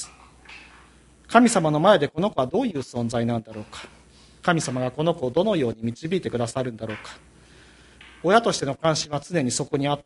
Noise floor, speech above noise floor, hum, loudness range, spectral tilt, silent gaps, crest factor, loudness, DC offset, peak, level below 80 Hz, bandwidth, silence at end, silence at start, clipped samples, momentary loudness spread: -52 dBFS; 30 dB; none; 4 LU; -5 dB/octave; none; 22 dB; -23 LUFS; under 0.1%; -2 dBFS; -56 dBFS; 11.5 kHz; 0.05 s; 0 s; under 0.1%; 20 LU